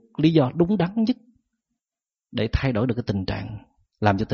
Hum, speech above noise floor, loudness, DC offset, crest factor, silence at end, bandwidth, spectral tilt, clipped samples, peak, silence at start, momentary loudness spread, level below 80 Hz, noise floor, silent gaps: none; over 68 dB; -23 LUFS; under 0.1%; 18 dB; 0 s; 6.8 kHz; -6.5 dB/octave; under 0.1%; -4 dBFS; 0.2 s; 12 LU; -40 dBFS; under -90 dBFS; none